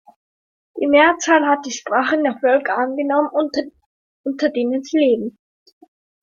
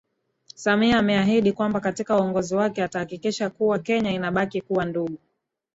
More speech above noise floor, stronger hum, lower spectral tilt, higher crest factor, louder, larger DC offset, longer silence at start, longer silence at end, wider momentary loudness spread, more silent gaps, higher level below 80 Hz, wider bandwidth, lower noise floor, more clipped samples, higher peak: first, over 73 dB vs 30 dB; neither; second, -3 dB/octave vs -5.5 dB/octave; about the same, 18 dB vs 18 dB; first, -18 LUFS vs -23 LUFS; neither; first, 0.75 s vs 0.6 s; first, 0.95 s vs 0.6 s; first, 13 LU vs 9 LU; first, 3.86-4.24 s vs none; second, -64 dBFS vs -54 dBFS; about the same, 7.6 kHz vs 8 kHz; first, under -90 dBFS vs -52 dBFS; neither; first, -2 dBFS vs -6 dBFS